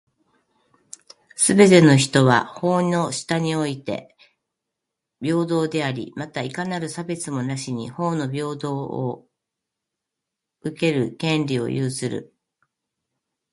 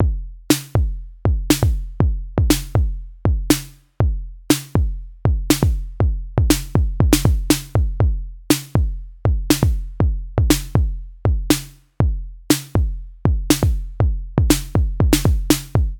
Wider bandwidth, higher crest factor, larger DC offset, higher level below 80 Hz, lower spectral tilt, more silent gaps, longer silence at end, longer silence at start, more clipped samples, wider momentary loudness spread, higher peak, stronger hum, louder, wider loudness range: second, 11.5 kHz vs 19.5 kHz; about the same, 22 dB vs 18 dB; neither; second, -62 dBFS vs -22 dBFS; about the same, -5 dB/octave vs -5.5 dB/octave; neither; first, 1.3 s vs 0 s; first, 1.35 s vs 0 s; neither; first, 16 LU vs 6 LU; about the same, 0 dBFS vs 0 dBFS; neither; about the same, -21 LUFS vs -20 LUFS; first, 10 LU vs 2 LU